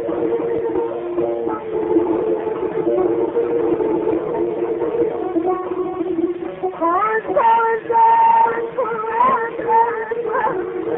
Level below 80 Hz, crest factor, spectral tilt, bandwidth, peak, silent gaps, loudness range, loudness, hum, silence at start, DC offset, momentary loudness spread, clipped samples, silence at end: -54 dBFS; 14 dB; -9.5 dB/octave; 3.8 kHz; -4 dBFS; none; 4 LU; -19 LUFS; none; 0 s; under 0.1%; 8 LU; under 0.1%; 0 s